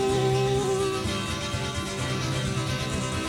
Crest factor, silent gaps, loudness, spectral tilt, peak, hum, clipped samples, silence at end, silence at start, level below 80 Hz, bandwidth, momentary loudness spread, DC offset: 14 dB; none; -27 LUFS; -4.5 dB/octave; -12 dBFS; none; under 0.1%; 0 s; 0 s; -42 dBFS; 16.5 kHz; 5 LU; under 0.1%